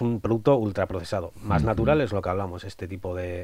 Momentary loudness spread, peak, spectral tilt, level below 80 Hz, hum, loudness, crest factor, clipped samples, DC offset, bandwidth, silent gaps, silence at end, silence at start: 12 LU; -8 dBFS; -8 dB/octave; -42 dBFS; none; -26 LUFS; 18 dB; under 0.1%; under 0.1%; 15.5 kHz; none; 0 s; 0 s